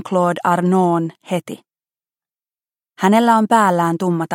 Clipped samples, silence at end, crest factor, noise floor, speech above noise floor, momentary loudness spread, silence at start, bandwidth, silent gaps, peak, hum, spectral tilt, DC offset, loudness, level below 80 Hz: under 0.1%; 0 s; 16 dB; under -90 dBFS; over 74 dB; 11 LU; 0.05 s; 16.5 kHz; none; -2 dBFS; none; -6.5 dB/octave; under 0.1%; -16 LUFS; -70 dBFS